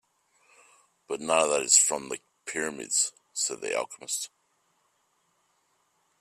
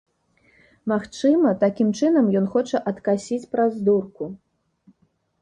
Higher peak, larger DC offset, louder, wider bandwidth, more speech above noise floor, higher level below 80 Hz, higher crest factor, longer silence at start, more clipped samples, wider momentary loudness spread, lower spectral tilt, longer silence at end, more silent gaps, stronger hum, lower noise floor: about the same, -6 dBFS vs -6 dBFS; neither; second, -26 LUFS vs -21 LUFS; first, 15.5 kHz vs 9.8 kHz; about the same, 44 dB vs 45 dB; second, -78 dBFS vs -64 dBFS; first, 26 dB vs 16 dB; first, 1.1 s vs 0.85 s; neither; first, 17 LU vs 10 LU; second, 0 dB/octave vs -7 dB/octave; first, 1.95 s vs 1.05 s; neither; neither; first, -72 dBFS vs -66 dBFS